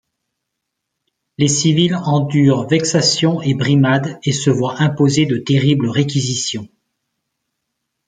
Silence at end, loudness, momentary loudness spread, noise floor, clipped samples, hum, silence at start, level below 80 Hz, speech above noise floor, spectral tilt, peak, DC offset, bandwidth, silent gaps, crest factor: 1.4 s; -15 LUFS; 5 LU; -77 dBFS; under 0.1%; none; 1.4 s; -54 dBFS; 62 dB; -5 dB/octave; 0 dBFS; under 0.1%; 9.4 kHz; none; 16 dB